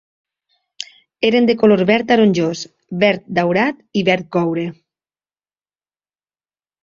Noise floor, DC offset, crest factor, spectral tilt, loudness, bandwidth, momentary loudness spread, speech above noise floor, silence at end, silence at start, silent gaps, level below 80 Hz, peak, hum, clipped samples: under -90 dBFS; under 0.1%; 18 dB; -6 dB/octave; -16 LUFS; 7.6 kHz; 16 LU; over 74 dB; 2.1 s; 0.8 s; none; -60 dBFS; -2 dBFS; none; under 0.1%